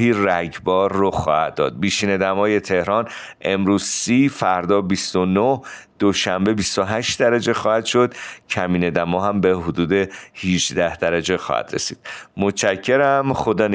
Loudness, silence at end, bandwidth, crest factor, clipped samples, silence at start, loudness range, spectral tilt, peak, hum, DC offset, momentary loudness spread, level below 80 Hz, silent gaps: -19 LUFS; 0 s; 10 kHz; 16 dB; under 0.1%; 0 s; 2 LU; -4.5 dB/octave; -4 dBFS; none; under 0.1%; 6 LU; -50 dBFS; none